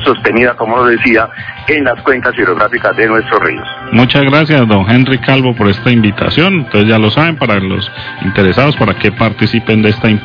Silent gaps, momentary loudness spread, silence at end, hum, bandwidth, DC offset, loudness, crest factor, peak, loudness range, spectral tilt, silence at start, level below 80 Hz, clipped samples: none; 5 LU; 0 s; none; 5.4 kHz; under 0.1%; -10 LUFS; 10 dB; 0 dBFS; 2 LU; -8.5 dB/octave; 0 s; -38 dBFS; 1%